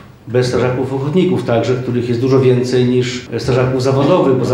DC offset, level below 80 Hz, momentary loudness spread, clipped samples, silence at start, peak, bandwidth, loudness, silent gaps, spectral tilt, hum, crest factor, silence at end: under 0.1%; -46 dBFS; 6 LU; under 0.1%; 0.05 s; 0 dBFS; 11.5 kHz; -14 LUFS; none; -7 dB/octave; none; 12 dB; 0 s